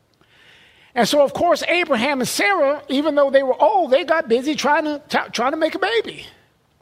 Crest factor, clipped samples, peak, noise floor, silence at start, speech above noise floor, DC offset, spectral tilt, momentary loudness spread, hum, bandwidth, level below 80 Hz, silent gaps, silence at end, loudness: 16 dB; under 0.1%; -2 dBFS; -53 dBFS; 0.95 s; 35 dB; under 0.1%; -3.5 dB/octave; 6 LU; none; 16 kHz; -60 dBFS; none; 0.5 s; -18 LUFS